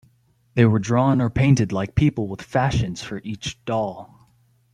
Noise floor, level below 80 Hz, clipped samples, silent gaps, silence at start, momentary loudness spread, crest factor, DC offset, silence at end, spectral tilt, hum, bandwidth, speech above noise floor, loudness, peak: -60 dBFS; -44 dBFS; under 0.1%; none; 0.55 s; 12 LU; 20 dB; under 0.1%; 0.7 s; -7 dB/octave; none; 10 kHz; 40 dB; -21 LUFS; -2 dBFS